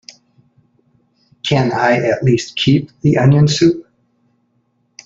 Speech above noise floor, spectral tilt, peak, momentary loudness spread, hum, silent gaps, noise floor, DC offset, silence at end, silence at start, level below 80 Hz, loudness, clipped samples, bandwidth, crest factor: 50 dB; -6 dB/octave; -2 dBFS; 6 LU; none; none; -63 dBFS; under 0.1%; 1.25 s; 1.45 s; -50 dBFS; -14 LUFS; under 0.1%; 7.8 kHz; 14 dB